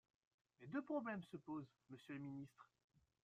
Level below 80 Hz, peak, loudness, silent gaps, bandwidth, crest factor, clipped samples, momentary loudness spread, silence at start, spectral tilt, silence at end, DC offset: -88 dBFS; -34 dBFS; -50 LUFS; none; 10 kHz; 18 dB; under 0.1%; 15 LU; 0.6 s; -8 dB/octave; 0.6 s; under 0.1%